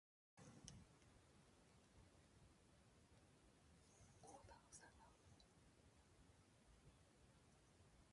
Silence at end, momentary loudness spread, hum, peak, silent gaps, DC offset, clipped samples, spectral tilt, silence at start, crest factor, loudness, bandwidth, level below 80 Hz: 0 s; 5 LU; none; -38 dBFS; none; under 0.1%; under 0.1%; -4 dB/octave; 0.35 s; 32 dB; -66 LUFS; 11 kHz; -78 dBFS